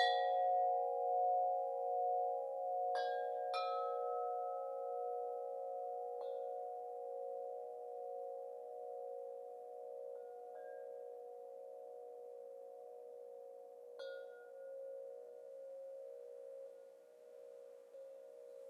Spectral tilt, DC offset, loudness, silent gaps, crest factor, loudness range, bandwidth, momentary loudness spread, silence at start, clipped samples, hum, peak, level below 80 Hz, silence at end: -0.5 dB/octave; under 0.1%; -43 LUFS; none; 20 dB; 14 LU; 12 kHz; 19 LU; 0 s; under 0.1%; none; -22 dBFS; under -90 dBFS; 0 s